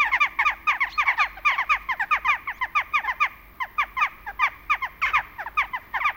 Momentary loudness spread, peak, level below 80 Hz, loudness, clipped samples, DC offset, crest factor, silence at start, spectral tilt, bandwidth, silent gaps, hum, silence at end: 5 LU; -8 dBFS; -52 dBFS; -23 LUFS; under 0.1%; under 0.1%; 18 dB; 0 s; -1 dB/octave; 17 kHz; none; none; 0 s